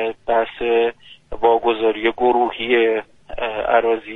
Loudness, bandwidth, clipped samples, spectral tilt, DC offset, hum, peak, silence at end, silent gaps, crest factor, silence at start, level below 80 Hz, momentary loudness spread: -19 LUFS; 4 kHz; under 0.1%; -6 dB/octave; under 0.1%; none; -2 dBFS; 0 s; none; 18 dB; 0 s; -46 dBFS; 9 LU